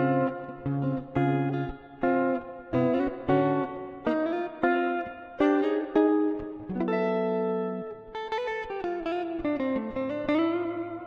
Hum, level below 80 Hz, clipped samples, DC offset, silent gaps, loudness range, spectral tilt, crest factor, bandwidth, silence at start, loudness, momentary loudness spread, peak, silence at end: none; -54 dBFS; under 0.1%; under 0.1%; none; 3 LU; -9 dB/octave; 16 dB; 6.6 kHz; 0 s; -28 LUFS; 9 LU; -10 dBFS; 0 s